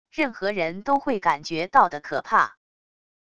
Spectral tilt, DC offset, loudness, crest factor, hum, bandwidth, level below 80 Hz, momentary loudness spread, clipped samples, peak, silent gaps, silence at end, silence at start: -5 dB/octave; 0.4%; -23 LUFS; 22 dB; none; 11 kHz; -60 dBFS; 8 LU; under 0.1%; -4 dBFS; none; 0.75 s; 0.15 s